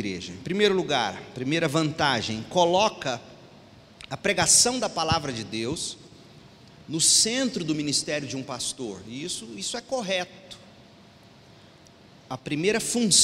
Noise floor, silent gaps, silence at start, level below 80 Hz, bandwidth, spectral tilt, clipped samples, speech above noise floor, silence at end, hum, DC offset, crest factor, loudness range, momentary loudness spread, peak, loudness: -52 dBFS; none; 0 s; -58 dBFS; 16 kHz; -2.5 dB/octave; under 0.1%; 27 dB; 0 s; none; under 0.1%; 22 dB; 9 LU; 17 LU; -6 dBFS; -24 LUFS